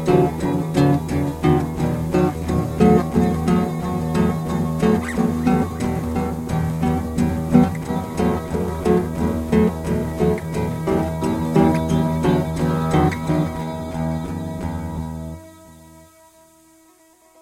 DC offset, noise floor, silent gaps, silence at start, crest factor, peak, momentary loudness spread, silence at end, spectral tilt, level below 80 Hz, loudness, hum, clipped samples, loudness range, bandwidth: under 0.1%; -53 dBFS; none; 0 s; 20 dB; 0 dBFS; 9 LU; 1.4 s; -7.5 dB/octave; -38 dBFS; -20 LUFS; none; under 0.1%; 6 LU; 16 kHz